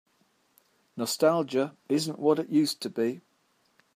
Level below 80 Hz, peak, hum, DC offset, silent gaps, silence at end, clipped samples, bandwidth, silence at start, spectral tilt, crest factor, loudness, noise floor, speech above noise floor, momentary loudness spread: -80 dBFS; -10 dBFS; none; under 0.1%; none; 0.75 s; under 0.1%; 15.5 kHz; 0.95 s; -5 dB/octave; 18 dB; -27 LUFS; -70 dBFS; 43 dB; 9 LU